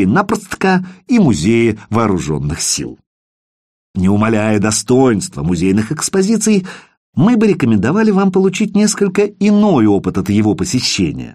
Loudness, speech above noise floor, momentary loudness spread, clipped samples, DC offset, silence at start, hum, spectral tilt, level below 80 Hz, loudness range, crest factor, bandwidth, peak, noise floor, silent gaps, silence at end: -14 LUFS; over 77 dB; 6 LU; under 0.1%; under 0.1%; 0 s; none; -5.5 dB/octave; -40 dBFS; 3 LU; 12 dB; 15 kHz; -2 dBFS; under -90 dBFS; 3.06-3.94 s, 6.97-7.13 s; 0 s